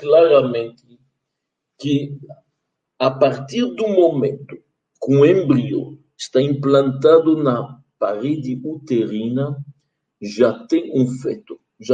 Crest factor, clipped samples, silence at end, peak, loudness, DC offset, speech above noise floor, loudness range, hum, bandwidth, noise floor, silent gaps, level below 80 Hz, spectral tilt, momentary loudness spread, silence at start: 16 dB; under 0.1%; 0 s; -2 dBFS; -18 LUFS; under 0.1%; 62 dB; 6 LU; none; 9.2 kHz; -79 dBFS; none; -64 dBFS; -7.5 dB/octave; 18 LU; 0 s